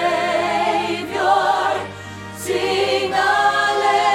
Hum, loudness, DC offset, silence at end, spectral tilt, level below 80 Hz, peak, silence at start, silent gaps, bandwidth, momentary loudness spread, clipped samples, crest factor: none; -18 LUFS; under 0.1%; 0 s; -3 dB/octave; -58 dBFS; -4 dBFS; 0 s; none; 16 kHz; 11 LU; under 0.1%; 14 dB